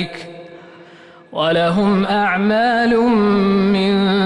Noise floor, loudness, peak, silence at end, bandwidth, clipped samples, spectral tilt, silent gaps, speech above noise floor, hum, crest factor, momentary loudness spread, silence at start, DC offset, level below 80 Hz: -42 dBFS; -15 LUFS; -6 dBFS; 0 s; 10 kHz; under 0.1%; -7 dB/octave; none; 27 dB; none; 10 dB; 12 LU; 0 s; under 0.1%; -48 dBFS